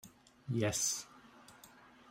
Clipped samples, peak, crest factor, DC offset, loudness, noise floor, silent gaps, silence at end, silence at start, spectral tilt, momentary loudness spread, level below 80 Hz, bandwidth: under 0.1%; -20 dBFS; 20 dB; under 0.1%; -35 LUFS; -60 dBFS; none; 0.25 s; 0.05 s; -3.5 dB/octave; 25 LU; -70 dBFS; 16 kHz